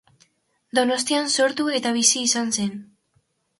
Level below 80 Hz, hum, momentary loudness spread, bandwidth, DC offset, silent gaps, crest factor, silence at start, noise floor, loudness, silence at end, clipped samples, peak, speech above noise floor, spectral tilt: -70 dBFS; none; 8 LU; 12 kHz; under 0.1%; none; 20 dB; 0.75 s; -68 dBFS; -21 LUFS; 0.75 s; under 0.1%; -4 dBFS; 46 dB; -1.5 dB/octave